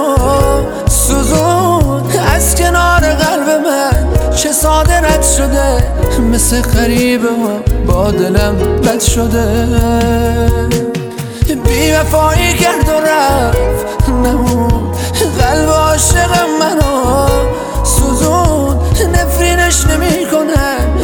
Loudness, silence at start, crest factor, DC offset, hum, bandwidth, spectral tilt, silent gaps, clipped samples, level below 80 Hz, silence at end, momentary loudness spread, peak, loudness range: -11 LUFS; 0 s; 10 dB; under 0.1%; none; over 20 kHz; -4.5 dB/octave; none; under 0.1%; -16 dBFS; 0 s; 4 LU; 0 dBFS; 1 LU